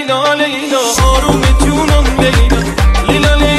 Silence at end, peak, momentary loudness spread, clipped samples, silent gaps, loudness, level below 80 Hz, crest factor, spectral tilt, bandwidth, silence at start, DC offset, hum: 0 s; 0 dBFS; 2 LU; under 0.1%; none; -11 LUFS; -14 dBFS; 10 dB; -4.5 dB/octave; 14 kHz; 0 s; under 0.1%; none